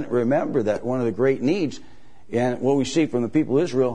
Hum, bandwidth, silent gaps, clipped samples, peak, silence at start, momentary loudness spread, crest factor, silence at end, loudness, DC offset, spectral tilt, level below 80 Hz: none; 10 kHz; none; under 0.1%; -8 dBFS; 0 s; 4 LU; 14 dB; 0 s; -22 LUFS; 1%; -6.5 dB/octave; -56 dBFS